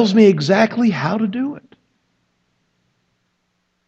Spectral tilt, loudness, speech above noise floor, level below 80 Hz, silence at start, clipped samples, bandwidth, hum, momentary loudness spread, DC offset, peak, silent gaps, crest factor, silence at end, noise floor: -6.5 dB/octave; -16 LUFS; 54 dB; -68 dBFS; 0 s; under 0.1%; 7.8 kHz; none; 13 LU; under 0.1%; 0 dBFS; none; 18 dB; 2.3 s; -69 dBFS